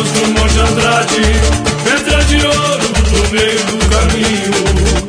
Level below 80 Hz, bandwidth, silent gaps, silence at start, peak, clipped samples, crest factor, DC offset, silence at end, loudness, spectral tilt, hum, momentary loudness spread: -16 dBFS; 11 kHz; none; 0 s; 0 dBFS; under 0.1%; 12 dB; under 0.1%; 0 s; -11 LUFS; -4 dB/octave; none; 2 LU